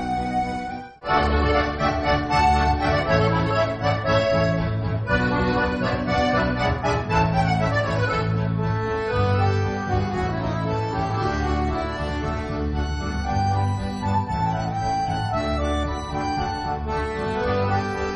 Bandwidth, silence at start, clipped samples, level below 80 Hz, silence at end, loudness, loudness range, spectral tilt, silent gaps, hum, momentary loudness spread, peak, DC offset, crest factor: 9.4 kHz; 0 s; under 0.1%; -32 dBFS; 0 s; -23 LUFS; 4 LU; -6.5 dB/octave; none; none; 6 LU; -6 dBFS; under 0.1%; 16 dB